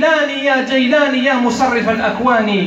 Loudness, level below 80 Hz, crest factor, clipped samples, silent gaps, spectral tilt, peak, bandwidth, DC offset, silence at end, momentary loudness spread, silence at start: -14 LUFS; -50 dBFS; 12 dB; under 0.1%; none; -4.5 dB/octave; -2 dBFS; 8.2 kHz; under 0.1%; 0 s; 2 LU; 0 s